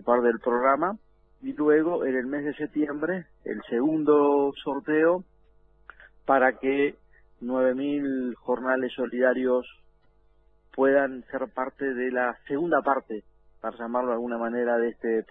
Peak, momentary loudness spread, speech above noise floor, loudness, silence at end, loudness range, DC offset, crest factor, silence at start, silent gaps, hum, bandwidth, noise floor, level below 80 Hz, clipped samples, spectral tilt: -8 dBFS; 13 LU; 37 dB; -26 LUFS; 0.05 s; 3 LU; under 0.1%; 18 dB; 0.05 s; none; none; 3.8 kHz; -62 dBFS; -62 dBFS; under 0.1%; -9.5 dB/octave